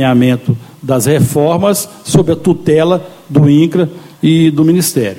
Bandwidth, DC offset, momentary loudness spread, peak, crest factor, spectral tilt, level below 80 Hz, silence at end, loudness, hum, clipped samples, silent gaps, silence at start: 17 kHz; under 0.1%; 7 LU; 0 dBFS; 10 dB; -6 dB/octave; -44 dBFS; 0 s; -11 LUFS; none; under 0.1%; none; 0 s